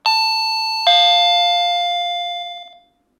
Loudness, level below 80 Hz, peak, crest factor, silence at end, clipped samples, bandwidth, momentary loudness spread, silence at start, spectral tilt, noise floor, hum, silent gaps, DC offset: -14 LUFS; -76 dBFS; -2 dBFS; 14 dB; 0.5 s; under 0.1%; 18.5 kHz; 15 LU; 0.05 s; 4 dB/octave; -50 dBFS; none; none; under 0.1%